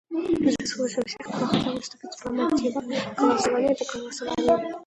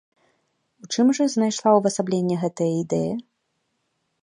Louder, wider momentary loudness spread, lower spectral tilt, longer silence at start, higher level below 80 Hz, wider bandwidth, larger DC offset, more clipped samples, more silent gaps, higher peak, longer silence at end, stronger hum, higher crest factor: second, -25 LUFS vs -22 LUFS; about the same, 9 LU vs 8 LU; about the same, -4.5 dB/octave vs -5.5 dB/octave; second, 0.1 s vs 0.85 s; first, -56 dBFS vs -66 dBFS; about the same, 11.5 kHz vs 11 kHz; neither; neither; neither; second, -8 dBFS vs -4 dBFS; second, 0 s vs 1 s; neither; about the same, 18 dB vs 20 dB